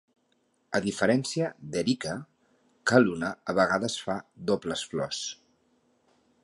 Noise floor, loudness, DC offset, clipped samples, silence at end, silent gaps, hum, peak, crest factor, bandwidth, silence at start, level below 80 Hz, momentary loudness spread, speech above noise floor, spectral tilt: -71 dBFS; -28 LUFS; under 0.1%; under 0.1%; 1.1 s; none; none; -6 dBFS; 24 dB; 11.5 kHz; 0.7 s; -64 dBFS; 11 LU; 44 dB; -4.5 dB/octave